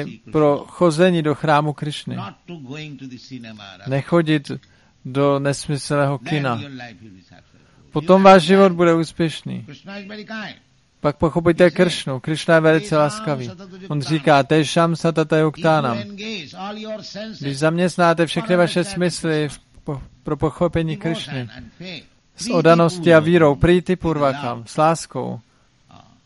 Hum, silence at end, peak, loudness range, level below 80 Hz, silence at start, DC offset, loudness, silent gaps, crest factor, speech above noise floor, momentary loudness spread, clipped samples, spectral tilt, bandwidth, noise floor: none; 0.85 s; 0 dBFS; 7 LU; -46 dBFS; 0 s; under 0.1%; -18 LUFS; none; 18 dB; 33 dB; 20 LU; under 0.1%; -6 dB/octave; 11.5 kHz; -51 dBFS